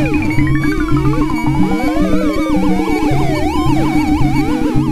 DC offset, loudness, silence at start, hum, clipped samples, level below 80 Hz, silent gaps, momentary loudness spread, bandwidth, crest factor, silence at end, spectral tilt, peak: under 0.1%; -15 LUFS; 0 s; none; under 0.1%; -22 dBFS; none; 1 LU; 15 kHz; 12 dB; 0 s; -7 dB/octave; 0 dBFS